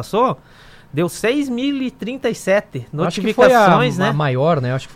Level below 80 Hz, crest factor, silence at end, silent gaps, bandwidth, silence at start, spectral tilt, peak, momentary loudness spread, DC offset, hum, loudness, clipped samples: -50 dBFS; 16 dB; 0 s; none; 16 kHz; 0 s; -6 dB/octave; -2 dBFS; 12 LU; under 0.1%; none; -17 LUFS; under 0.1%